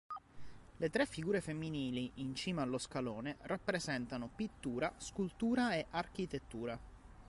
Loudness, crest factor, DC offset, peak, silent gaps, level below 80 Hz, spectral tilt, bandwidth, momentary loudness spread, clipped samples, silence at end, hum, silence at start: -40 LUFS; 20 dB; under 0.1%; -20 dBFS; none; -62 dBFS; -5 dB/octave; 11.5 kHz; 8 LU; under 0.1%; 0 s; none; 0.1 s